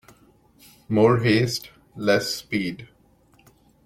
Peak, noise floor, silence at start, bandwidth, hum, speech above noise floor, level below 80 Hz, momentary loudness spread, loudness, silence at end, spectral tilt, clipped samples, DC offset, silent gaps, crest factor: -4 dBFS; -58 dBFS; 0.9 s; 16.5 kHz; none; 37 dB; -58 dBFS; 13 LU; -22 LUFS; 1 s; -5.5 dB/octave; under 0.1%; under 0.1%; none; 20 dB